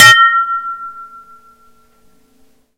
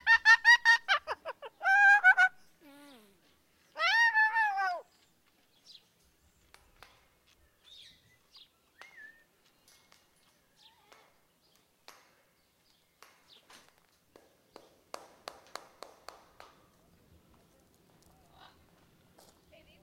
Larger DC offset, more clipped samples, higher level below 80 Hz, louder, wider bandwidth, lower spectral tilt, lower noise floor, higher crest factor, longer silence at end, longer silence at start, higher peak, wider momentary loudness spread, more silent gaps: first, 0.3% vs under 0.1%; first, 1% vs under 0.1%; first, -58 dBFS vs -76 dBFS; first, -10 LUFS vs -24 LUFS; first, over 20 kHz vs 16 kHz; about the same, 0.5 dB/octave vs 1 dB/octave; second, -53 dBFS vs -70 dBFS; second, 14 dB vs 22 dB; second, 1.75 s vs 15 s; about the same, 0 s vs 0.05 s; first, 0 dBFS vs -10 dBFS; about the same, 28 LU vs 30 LU; neither